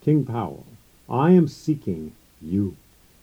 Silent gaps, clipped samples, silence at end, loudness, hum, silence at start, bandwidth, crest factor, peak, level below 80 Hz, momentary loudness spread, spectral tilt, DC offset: none; under 0.1%; 0.5 s; -23 LUFS; none; 0.05 s; 15 kHz; 18 dB; -6 dBFS; -56 dBFS; 20 LU; -9 dB/octave; under 0.1%